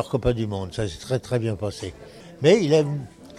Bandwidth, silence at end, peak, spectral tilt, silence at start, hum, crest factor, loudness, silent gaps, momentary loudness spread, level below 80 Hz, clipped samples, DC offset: 13.5 kHz; 0 s; -6 dBFS; -6.5 dB/octave; 0 s; none; 18 dB; -23 LUFS; none; 17 LU; -44 dBFS; under 0.1%; under 0.1%